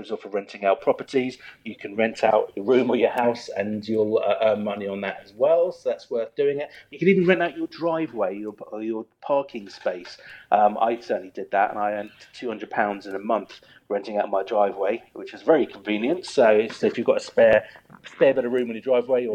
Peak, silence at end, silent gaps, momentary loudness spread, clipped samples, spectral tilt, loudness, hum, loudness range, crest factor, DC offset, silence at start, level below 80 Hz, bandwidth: -4 dBFS; 0 s; none; 13 LU; under 0.1%; -6 dB/octave; -23 LUFS; none; 5 LU; 18 dB; under 0.1%; 0 s; -68 dBFS; 9.4 kHz